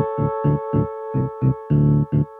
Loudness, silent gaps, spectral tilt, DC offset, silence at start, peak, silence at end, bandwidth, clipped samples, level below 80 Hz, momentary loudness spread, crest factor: -21 LUFS; none; -13 dB/octave; under 0.1%; 0 s; -6 dBFS; 0 s; 3 kHz; under 0.1%; -40 dBFS; 7 LU; 14 dB